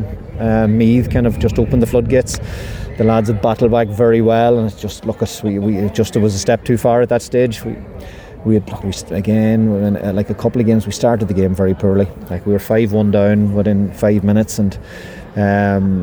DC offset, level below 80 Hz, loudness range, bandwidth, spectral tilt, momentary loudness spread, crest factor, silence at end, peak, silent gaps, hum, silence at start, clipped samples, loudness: under 0.1%; -32 dBFS; 2 LU; over 20 kHz; -7 dB/octave; 11 LU; 12 dB; 0 s; -2 dBFS; none; none; 0 s; under 0.1%; -15 LUFS